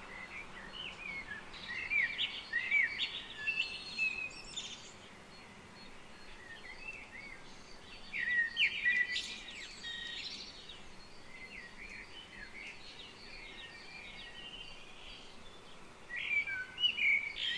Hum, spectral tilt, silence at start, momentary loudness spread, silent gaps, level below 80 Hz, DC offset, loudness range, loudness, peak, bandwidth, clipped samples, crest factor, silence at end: none; -1 dB/octave; 0 s; 23 LU; none; -62 dBFS; under 0.1%; 14 LU; -35 LUFS; -20 dBFS; 11 kHz; under 0.1%; 20 dB; 0 s